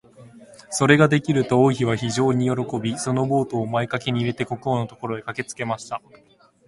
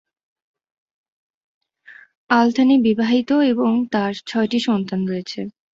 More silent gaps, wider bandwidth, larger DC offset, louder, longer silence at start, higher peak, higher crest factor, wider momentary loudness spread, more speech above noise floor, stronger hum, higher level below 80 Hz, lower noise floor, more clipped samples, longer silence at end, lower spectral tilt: second, none vs 2.17-2.29 s; first, 11.5 kHz vs 7.8 kHz; neither; second, -22 LUFS vs -18 LUFS; second, 0.2 s vs 1.9 s; about the same, -2 dBFS vs -2 dBFS; about the same, 20 dB vs 18 dB; first, 12 LU vs 9 LU; second, 25 dB vs 29 dB; neither; first, -56 dBFS vs -62 dBFS; about the same, -46 dBFS vs -47 dBFS; neither; first, 0.7 s vs 0.25 s; about the same, -5.5 dB/octave vs -6 dB/octave